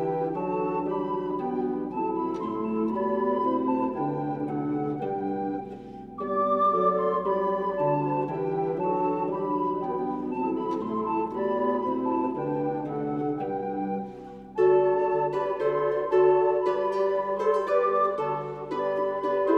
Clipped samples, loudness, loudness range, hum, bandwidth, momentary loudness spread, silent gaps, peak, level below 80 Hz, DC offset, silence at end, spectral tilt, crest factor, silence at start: under 0.1%; -27 LUFS; 4 LU; none; 6.2 kHz; 8 LU; none; -10 dBFS; -60 dBFS; under 0.1%; 0 s; -9 dB/octave; 16 dB; 0 s